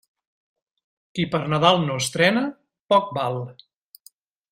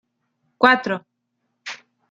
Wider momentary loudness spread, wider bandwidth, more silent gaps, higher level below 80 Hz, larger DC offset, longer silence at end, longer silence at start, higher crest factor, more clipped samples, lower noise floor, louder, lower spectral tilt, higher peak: second, 13 LU vs 21 LU; first, 15.5 kHz vs 7.8 kHz; first, 2.80-2.89 s vs none; first, -62 dBFS vs -72 dBFS; neither; first, 1 s vs 0.35 s; first, 1.15 s vs 0.6 s; about the same, 22 dB vs 22 dB; neither; second, -56 dBFS vs -75 dBFS; second, -21 LUFS vs -18 LUFS; about the same, -4.5 dB/octave vs -4.5 dB/octave; about the same, -2 dBFS vs -2 dBFS